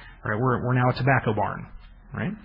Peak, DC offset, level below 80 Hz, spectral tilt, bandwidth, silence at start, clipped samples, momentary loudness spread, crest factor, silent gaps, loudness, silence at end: -6 dBFS; under 0.1%; -48 dBFS; -10.5 dB/octave; 5.4 kHz; 0 s; under 0.1%; 16 LU; 18 dB; none; -24 LUFS; 0.05 s